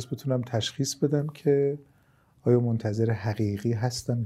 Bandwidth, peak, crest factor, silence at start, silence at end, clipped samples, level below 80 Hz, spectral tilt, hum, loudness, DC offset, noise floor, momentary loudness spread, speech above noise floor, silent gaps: 14.5 kHz; -10 dBFS; 18 dB; 0 s; 0 s; under 0.1%; -62 dBFS; -6 dB/octave; none; -27 LUFS; under 0.1%; -62 dBFS; 5 LU; 36 dB; none